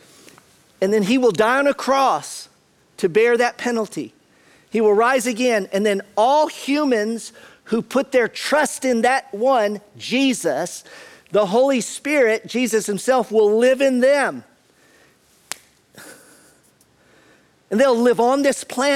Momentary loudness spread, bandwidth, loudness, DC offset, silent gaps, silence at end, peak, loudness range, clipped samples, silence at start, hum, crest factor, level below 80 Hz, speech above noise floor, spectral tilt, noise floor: 11 LU; 16 kHz; -18 LUFS; under 0.1%; none; 0 s; -4 dBFS; 3 LU; under 0.1%; 0.8 s; none; 16 dB; -66 dBFS; 39 dB; -4 dB/octave; -57 dBFS